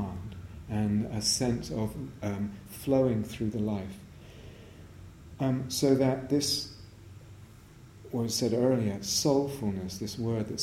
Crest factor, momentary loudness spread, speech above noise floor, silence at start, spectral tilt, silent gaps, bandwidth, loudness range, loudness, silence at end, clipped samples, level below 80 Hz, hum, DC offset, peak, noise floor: 20 dB; 23 LU; 22 dB; 0 s; -5 dB/octave; none; 16.5 kHz; 3 LU; -30 LUFS; 0 s; under 0.1%; -54 dBFS; none; under 0.1%; -12 dBFS; -52 dBFS